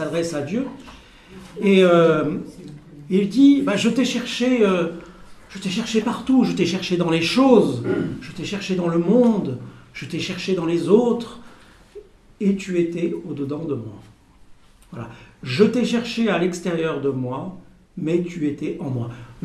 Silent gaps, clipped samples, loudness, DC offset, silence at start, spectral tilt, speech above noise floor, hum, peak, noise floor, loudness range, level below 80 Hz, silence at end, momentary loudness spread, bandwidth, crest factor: none; under 0.1%; -20 LUFS; under 0.1%; 0 s; -6 dB/octave; 28 dB; none; -2 dBFS; -48 dBFS; 7 LU; -54 dBFS; 0.05 s; 21 LU; 13 kHz; 18 dB